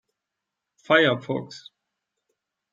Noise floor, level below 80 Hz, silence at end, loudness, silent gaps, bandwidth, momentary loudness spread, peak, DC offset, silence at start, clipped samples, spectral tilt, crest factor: -85 dBFS; -72 dBFS; 1.15 s; -22 LUFS; none; 7.8 kHz; 22 LU; -4 dBFS; under 0.1%; 0.9 s; under 0.1%; -5.5 dB/octave; 22 dB